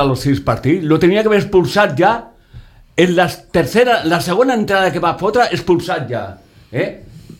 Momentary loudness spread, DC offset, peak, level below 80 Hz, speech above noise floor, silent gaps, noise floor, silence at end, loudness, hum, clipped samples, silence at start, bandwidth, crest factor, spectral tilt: 10 LU; under 0.1%; 0 dBFS; -42 dBFS; 25 dB; none; -39 dBFS; 0.1 s; -15 LUFS; none; under 0.1%; 0 s; 16.5 kHz; 14 dB; -6 dB/octave